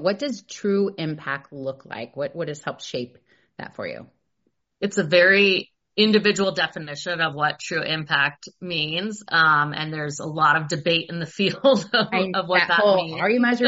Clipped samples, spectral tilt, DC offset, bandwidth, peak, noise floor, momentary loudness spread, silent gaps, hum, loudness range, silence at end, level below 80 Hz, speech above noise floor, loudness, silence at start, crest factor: under 0.1%; -2.5 dB/octave; under 0.1%; 8 kHz; -4 dBFS; -73 dBFS; 15 LU; none; none; 11 LU; 0 s; -66 dBFS; 51 dB; -21 LUFS; 0 s; 18 dB